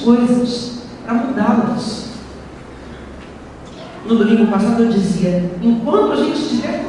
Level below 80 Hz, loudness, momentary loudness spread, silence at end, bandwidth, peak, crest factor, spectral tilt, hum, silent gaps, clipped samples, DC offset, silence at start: -44 dBFS; -16 LUFS; 21 LU; 0 s; 11 kHz; 0 dBFS; 16 dB; -6.5 dB/octave; none; none; under 0.1%; under 0.1%; 0 s